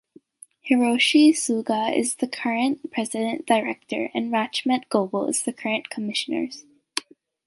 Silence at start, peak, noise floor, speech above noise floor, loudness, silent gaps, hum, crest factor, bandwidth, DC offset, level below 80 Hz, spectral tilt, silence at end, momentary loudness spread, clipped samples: 0.65 s; -4 dBFS; -51 dBFS; 28 dB; -23 LUFS; none; none; 18 dB; 11.5 kHz; under 0.1%; -74 dBFS; -3 dB/octave; 0.45 s; 12 LU; under 0.1%